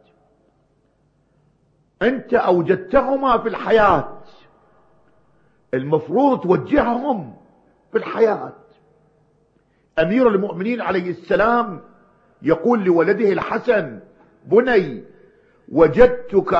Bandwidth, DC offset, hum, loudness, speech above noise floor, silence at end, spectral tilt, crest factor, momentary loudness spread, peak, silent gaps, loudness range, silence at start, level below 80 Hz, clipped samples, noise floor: 6.6 kHz; under 0.1%; none; -18 LUFS; 44 dB; 0 s; -8 dB/octave; 20 dB; 12 LU; 0 dBFS; none; 3 LU; 2 s; -44 dBFS; under 0.1%; -62 dBFS